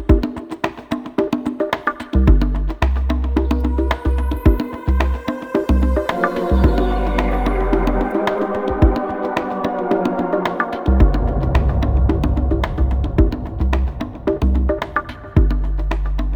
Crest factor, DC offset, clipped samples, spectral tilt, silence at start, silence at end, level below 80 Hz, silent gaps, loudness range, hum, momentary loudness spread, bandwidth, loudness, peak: 16 dB; under 0.1%; under 0.1%; -8.5 dB/octave; 0 s; 0 s; -20 dBFS; none; 2 LU; none; 6 LU; 7 kHz; -19 LUFS; 0 dBFS